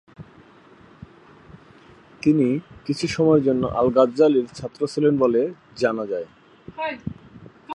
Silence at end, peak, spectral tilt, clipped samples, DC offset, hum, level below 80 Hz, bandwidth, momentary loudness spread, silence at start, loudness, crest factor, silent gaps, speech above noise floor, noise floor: 0 s; -4 dBFS; -7 dB/octave; under 0.1%; under 0.1%; none; -54 dBFS; 11 kHz; 15 LU; 0.2 s; -21 LUFS; 18 dB; none; 29 dB; -50 dBFS